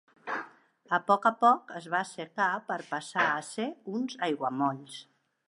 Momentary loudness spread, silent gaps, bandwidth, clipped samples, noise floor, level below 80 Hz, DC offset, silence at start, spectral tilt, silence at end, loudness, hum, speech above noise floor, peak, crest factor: 13 LU; none; 11.5 kHz; under 0.1%; -52 dBFS; -86 dBFS; under 0.1%; 0.25 s; -4.5 dB/octave; 0.45 s; -30 LUFS; none; 23 dB; -10 dBFS; 20 dB